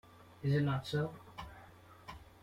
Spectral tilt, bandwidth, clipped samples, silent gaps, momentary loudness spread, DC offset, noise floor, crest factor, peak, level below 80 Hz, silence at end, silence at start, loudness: -7.5 dB/octave; 12 kHz; under 0.1%; none; 22 LU; under 0.1%; -58 dBFS; 16 dB; -22 dBFS; -62 dBFS; 0.15 s; 0.2 s; -36 LUFS